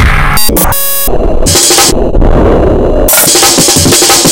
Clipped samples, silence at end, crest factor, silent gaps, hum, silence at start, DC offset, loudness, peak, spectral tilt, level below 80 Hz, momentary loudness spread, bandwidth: 2%; 0 s; 6 dB; none; none; 0 s; under 0.1%; -5 LUFS; 0 dBFS; -2.5 dB/octave; -12 dBFS; 6 LU; over 20 kHz